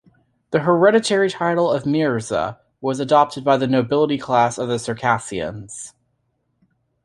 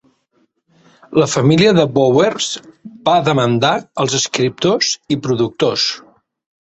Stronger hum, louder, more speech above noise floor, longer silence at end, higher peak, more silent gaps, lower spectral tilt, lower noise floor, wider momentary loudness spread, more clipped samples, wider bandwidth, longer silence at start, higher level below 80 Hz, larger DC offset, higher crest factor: neither; second, -19 LUFS vs -15 LUFS; first, 51 dB vs 47 dB; first, 1.15 s vs 0.65 s; about the same, -2 dBFS vs 0 dBFS; neither; about the same, -5.5 dB/octave vs -4.5 dB/octave; first, -69 dBFS vs -62 dBFS; first, 13 LU vs 8 LU; neither; first, 11.5 kHz vs 8.4 kHz; second, 0.5 s vs 1.1 s; about the same, -56 dBFS vs -54 dBFS; neither; about the same, 18 dB vs 16 dB